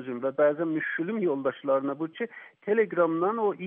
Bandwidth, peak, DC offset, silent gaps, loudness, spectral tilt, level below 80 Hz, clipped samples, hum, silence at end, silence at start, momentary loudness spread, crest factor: 3.7 kHz; -12 dBFS; under 0.1%; none; -27 LUFS; -5.5 dB/octave; -82 dBFS; under 0.1%; none; 0 s; 0 s; 9 LU; 16 dB